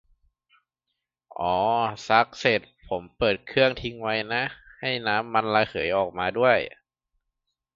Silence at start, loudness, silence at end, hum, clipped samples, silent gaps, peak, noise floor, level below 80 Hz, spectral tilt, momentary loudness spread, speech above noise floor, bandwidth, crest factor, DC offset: 1.4 s; -25 LUFS; 1.05 s; none; under 0.1%; none; -2 dBFS; -83 dBFS; -56 dBFS; -5 dB/octave; 11 LU; 58 dB; 7.6 kHz; 24 dB; under 0.1%